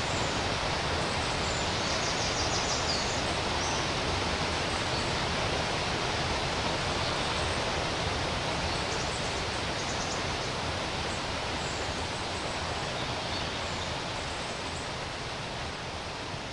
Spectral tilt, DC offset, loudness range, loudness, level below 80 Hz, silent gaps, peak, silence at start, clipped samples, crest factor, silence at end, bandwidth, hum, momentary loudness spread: -3 dB/octave; under 0.1%; 4 LU; -30 LUFS; -44 dBFS; none; -18 dBFS; 0 s; under 0.1%; 14 dB; 0 s; 11.5 kHz; none; 6 LU